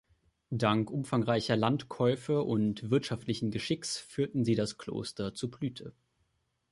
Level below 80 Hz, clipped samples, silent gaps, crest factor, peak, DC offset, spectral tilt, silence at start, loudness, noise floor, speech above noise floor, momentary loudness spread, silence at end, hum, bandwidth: -62 dBFS; under 0.1%; none; 18 dB; -14 dBFS; under 0.1%; -6 dB/octave; 0.5 s; -32 LUFS; -77 dBFS; 46 dB; 9 LU; 0.8 s; none; 11.5 kHz